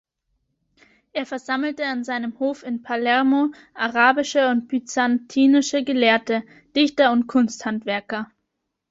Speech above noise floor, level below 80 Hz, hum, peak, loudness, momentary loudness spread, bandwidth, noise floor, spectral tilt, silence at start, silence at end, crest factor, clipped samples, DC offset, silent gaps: 57 dB; -68 dBFS; none; -2 dBFS; -21 LUFS; 11 LU; 8 kHz; -78 dBFS; -3.5 dB/octave; 1.15 s; 0.65 s; 20 dB; under 0.1%; under 0.1%; none